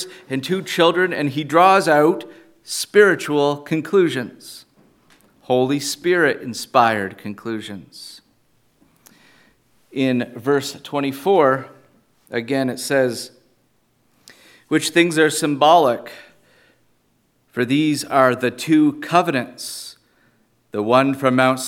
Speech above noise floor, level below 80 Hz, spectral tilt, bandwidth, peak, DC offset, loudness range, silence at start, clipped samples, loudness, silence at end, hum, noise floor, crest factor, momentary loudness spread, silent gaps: 45 dB; -70 dBFS; -4.5 dB/octave; 17 kHz; 0 dBFS; under 0.1%; 8 LU; 0 s; under 0.1%; -18 LUFS; 0 s; none; -63 dBFS; 20 dB; 16 LU; none